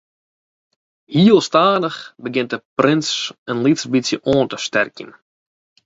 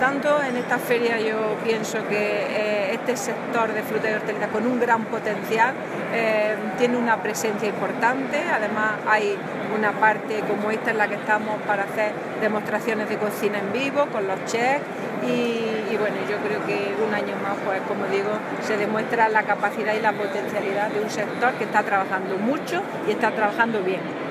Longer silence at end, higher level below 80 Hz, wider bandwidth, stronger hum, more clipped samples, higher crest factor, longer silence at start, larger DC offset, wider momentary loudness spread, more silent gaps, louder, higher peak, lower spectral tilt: first, 0.75 s vs 0 s; first, -58 dBFS vs -72 dBFS; second, 8 kHz vs 15.5 kHz; neither; neither; about the same, 18 dB vs 18 dB; first, 1.1 s vs 0 s; neither; first, 11 LU vs 5 LU; first, 2.65-2.76 s, 3.38-3.46 s vs none; first, -17 LUFS vs -23 LUFS; first, 0 dBFS vs -4 dBFS; about the same, -5 dB/octave vs -4.5 dB/octave